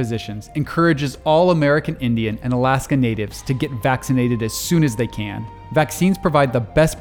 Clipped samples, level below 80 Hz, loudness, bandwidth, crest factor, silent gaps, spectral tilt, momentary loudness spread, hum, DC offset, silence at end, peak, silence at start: under 0.1%; -40 dBFS; -19 LUFS; over 20 kHz; 16 dB; none; -6 dB/octave; 9 LU; none; under 0.1%; 0 s; -2 dBFS; 0 s